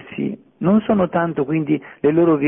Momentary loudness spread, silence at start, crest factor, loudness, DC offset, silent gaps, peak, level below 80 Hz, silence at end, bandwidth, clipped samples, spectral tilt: 10 LU; 0 s; 14 dB; -19 LUFS; under 0.1%; none; -4 dBFS; -52 dBFS; 0 s; 3.7 kHz; under 0.1%; -13 dB/octave